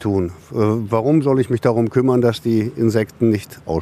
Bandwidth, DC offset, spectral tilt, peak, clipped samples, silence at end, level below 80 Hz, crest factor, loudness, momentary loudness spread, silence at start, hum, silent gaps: 14.5 kHz; under 0.1%; -8 dB/octave; -2 dBFS; under 0.1%; 0 s; -48 dBFS; 14 dB; -18 LUFS; 6 LU; 0 s; none; none